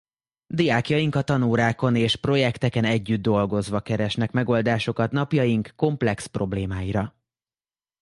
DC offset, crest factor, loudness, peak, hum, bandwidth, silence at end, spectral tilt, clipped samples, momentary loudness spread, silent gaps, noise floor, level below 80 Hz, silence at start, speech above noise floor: under 0.1%; 18 dB; -23 LUFS; -6 dBFS; none; 11.5 kHz; 0.95 s; -6.5 dB/octave; under 0.1%; 6 LU; none; under -90 dBFS; -48 dBFS; 0.5 s; over 68 dB